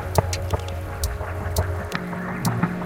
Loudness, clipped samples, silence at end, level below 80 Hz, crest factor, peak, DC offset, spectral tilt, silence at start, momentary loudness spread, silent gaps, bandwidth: -26 LUFS; under 0.1%; 0 s; -34 dBFS; 24 dB; -2 dBFS; under 0.1%; -5.5 dB/octave; 0 s; 5 LU; none; 17 kHz